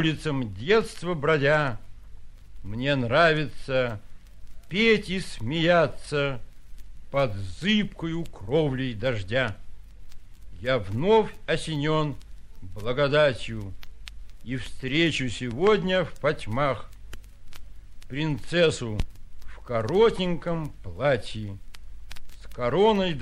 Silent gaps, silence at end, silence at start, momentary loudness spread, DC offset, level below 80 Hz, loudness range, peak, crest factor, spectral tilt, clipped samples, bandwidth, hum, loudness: none; 0 s; 0 s; 19 LU; under 0.1%; -42 dBFS; 3 LU; -8 dBFS; 18 dB; -6 dB/octave; under 0.1%; 12.5 kHz; none; -25 LUFS